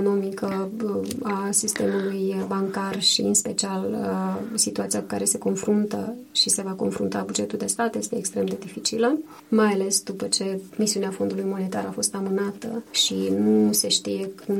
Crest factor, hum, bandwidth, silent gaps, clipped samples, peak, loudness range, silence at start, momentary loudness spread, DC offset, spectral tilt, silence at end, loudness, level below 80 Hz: 18 dB; none; 17 kHz; none; under 0.1%; -8 dBFS; 2 LU; 0 s; 8 LU; under 0.1%; -3.5 dB/octave; 0 s; -24 LUFS; -66 dBFS